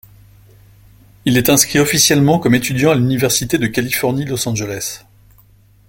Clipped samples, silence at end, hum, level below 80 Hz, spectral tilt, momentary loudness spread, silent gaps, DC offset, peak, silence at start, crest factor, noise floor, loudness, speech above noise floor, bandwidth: under 0.1%; 0.9 s; none; -44 dBFS; -4 dB/octave; 11 LU; none; under 0.1%; 0 dBFS; 1.25 s; 16 dB; -49 dBFS; -14 LUFS; 34 dB; 17 kHz